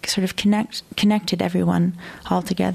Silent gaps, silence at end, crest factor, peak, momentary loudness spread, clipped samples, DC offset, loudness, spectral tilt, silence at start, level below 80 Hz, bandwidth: none; 0 s; 14 dB; -6 dBFS; 5 LU; under 0.1%; under 0.1%; -21 LUFS; -5.5 dB/octave; 0.05 s; -50 dBFS; 14.5 kHz